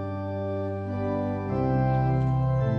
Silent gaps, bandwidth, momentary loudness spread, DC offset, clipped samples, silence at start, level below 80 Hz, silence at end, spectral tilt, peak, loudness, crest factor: none; 5.4 kHz; 7 LU; under 0.1%; under 0.1%; 0 s; -42 dBFS; 0 s; -10.5 dB/octave; -14 dBFS; -27 LUFS; 12 dB